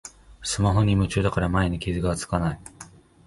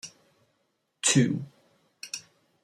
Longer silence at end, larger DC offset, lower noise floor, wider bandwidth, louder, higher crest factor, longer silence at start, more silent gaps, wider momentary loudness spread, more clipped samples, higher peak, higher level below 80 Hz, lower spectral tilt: about the same, 0.4 s vs 0.45 s; neither; second, -47 dBFS vs -75 dBFS; second, 11.5 kHz vs 15 kHz; about the same, -24 LUFS vs -26 LUFS; second, 16 dB vs 22 dB; about the same, 0.05 s vs 0.05 s; neither; second, 19 LU vs 23 LU; neither; about the same, -8 dBFS vs -10 dBFS; first, -36 dBFS vs -68 dBFS; first, -5.5 dB/octave vs -3.5 dB/octave